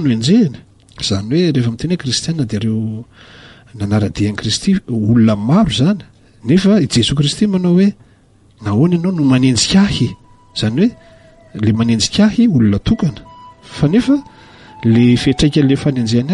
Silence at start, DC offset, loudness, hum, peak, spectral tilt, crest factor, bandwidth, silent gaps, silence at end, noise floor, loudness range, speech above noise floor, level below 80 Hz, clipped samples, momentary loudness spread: 0 s; under 0.1%; -14 LUFS; none; -2 dBFS; -6 dB/octave; 12 dB; 11.5 kHz; none; 0 s; -48 dBFS; 4 LU; 35 dB; -38 dBFS; under 0.1%; 9 LU